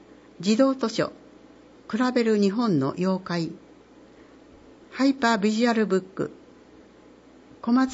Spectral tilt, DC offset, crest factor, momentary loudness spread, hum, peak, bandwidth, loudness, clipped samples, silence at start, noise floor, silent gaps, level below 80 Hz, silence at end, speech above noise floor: -6 dB/octave; under 0.1%; 18 dB; 12 LU; 60 Hz at -60 dBFS; -8 dBFS; 8 kHz; -24 LUFS; under 0.1%; 0.4 s; -51 dBFS; none; -66 dBFS; 0 s; 29 dB